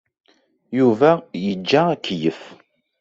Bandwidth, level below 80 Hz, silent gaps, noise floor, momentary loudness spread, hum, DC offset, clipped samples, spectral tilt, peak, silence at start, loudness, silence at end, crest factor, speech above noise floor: 7.6 kHz; -62 dBFS; none; -50 dBFS; 11 LU; none; under 0.1%; under 0.1%; -6.5 dB/octave; -2 dBFS; 0.7 s; -19 LUFS; 0.45 s; 18 dB; 32 dB